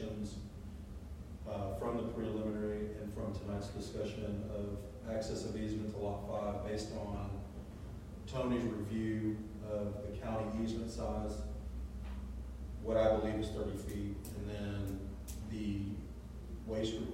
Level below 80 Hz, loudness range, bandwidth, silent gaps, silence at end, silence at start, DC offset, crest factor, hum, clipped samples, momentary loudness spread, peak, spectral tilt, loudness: -48 dBFS; 3 LU; 16 kHz; none; 0 s; 0 s; under 0.1%; 20 dB; none; under 0.1%; 11 LU; -20 dBFS; -7 dB/octave; -41 LUFS